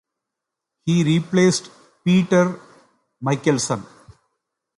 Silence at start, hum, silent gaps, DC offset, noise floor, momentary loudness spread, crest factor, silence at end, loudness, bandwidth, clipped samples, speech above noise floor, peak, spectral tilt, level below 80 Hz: 0.85 s; none; none; under 0.1%; -83 dBFS; 12 LU; 16 dB; 0.95 s; -20 LUFS; 11.5 kHz; under 0.1%; 65 dB; -4 dBFS; -5.5 dB/octave; -60 dBFS